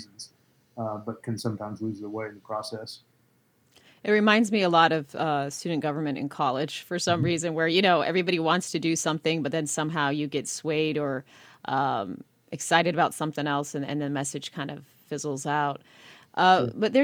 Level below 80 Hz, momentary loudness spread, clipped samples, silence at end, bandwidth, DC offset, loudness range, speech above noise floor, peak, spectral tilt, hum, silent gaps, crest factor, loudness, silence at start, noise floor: -72 dBFS; 15 LU; under 0.1%; 0 s; 19.5 kHz; under 0.1%; 6 LU; 39 dB; -4 dBFS; -4.5 dB/octave; none; none; 22 dB; -26 LUFS; 0 s; -66 dBFS